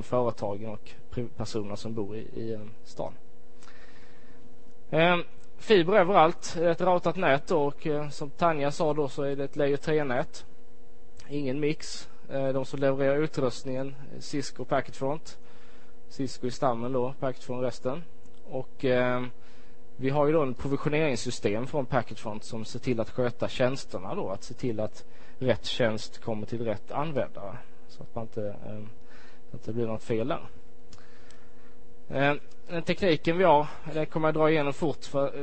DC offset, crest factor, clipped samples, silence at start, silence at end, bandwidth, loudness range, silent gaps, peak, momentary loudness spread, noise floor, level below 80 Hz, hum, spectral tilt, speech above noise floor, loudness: 3%; 22 dB; under 0.1%; 0 s; 0 s; 8.8 kHz; 11 LU; none; -6 dBFS; 14 LU; -55 dBFS; -56 dBFS; none; -6 dB/octave; 27 dB; -29 LUFS